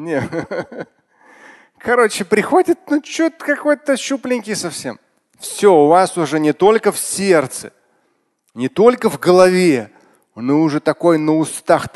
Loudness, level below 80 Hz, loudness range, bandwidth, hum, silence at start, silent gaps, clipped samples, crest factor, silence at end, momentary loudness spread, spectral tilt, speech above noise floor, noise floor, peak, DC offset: -15 LUFS; -58 dBFS; 3 LU; 12.5 kHz; none; 0 s; none; under 0.1%; 16 dB; 0.1 s; 15 LU; -5 dB/octave; 49 dB; -64 dBFS; 0 dBFS; under 0.1%